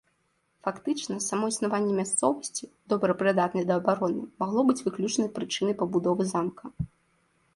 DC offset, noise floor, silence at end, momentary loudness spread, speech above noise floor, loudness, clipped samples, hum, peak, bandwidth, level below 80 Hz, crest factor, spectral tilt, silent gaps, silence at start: under 0.1%; -72 dBFS; 0.7 s; 10 LU; 45 dB; -28 LUFS; under 0.1%; none; -10 dBFS; 11.5 kHz; -60 dBFS; 18 dB; -4.5 dB/octave; none; 0.65 s